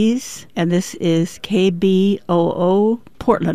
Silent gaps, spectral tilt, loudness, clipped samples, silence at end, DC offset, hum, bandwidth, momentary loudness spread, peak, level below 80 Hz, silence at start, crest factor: none; -6.5 dB/octave; -18 LUFS; under 0.1%; 0 s; 0.9%; none; 15 kHz; 6 LU; -2 dBFS; -50 dBFS; 0 s; 16 dB